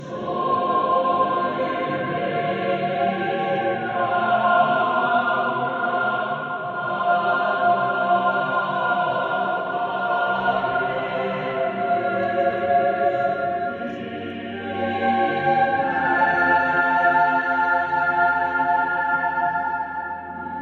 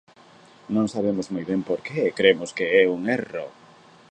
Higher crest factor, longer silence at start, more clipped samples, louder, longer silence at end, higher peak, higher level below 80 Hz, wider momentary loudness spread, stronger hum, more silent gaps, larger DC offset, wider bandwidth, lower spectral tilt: second, 16 dB vs 22 dB; second, 0 s vs 0.7 s; neither; about the same, -21 LUFS vs -23 LUFS; second, 0 s vs 0.65 s; second, -6 dBFS vs -2 dBFS; about the same, -62 dBFS vs -64 dBFS; about the same, 8 LU vs 9 LU; neither; neither; neither; second, 6.4 kHz vs 9.2 kHz; first, -7 dB/octave vs -5.5 dB/octave